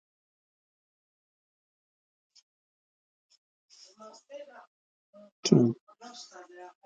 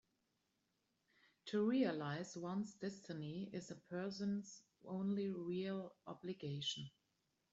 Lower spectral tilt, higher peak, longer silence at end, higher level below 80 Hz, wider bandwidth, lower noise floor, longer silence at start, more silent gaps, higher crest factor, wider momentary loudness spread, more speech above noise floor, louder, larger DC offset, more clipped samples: about the same, -6 dB/octave vs -5.5 dB/octave; first, -6 dBFS vs -26 dBFS; second, 0.2 s vs 0.65 s; first, -78 dBFS vs -84 dBFS; first, 9 kHz vs 8 kHz; first, under -90 dBFS vs -85 dBFS; first, 4.05 s vs 1.45 s; first, 4.67-5.13 s, 5.32-5.43 s, 5.81-5.87 s vs none; first, 30 dB vs 18 dB; first, 27 LU vs 13 LU; first, over 59 dB vs 42 dB; first, -26 LUFS vs -44 LUFS; neither; neither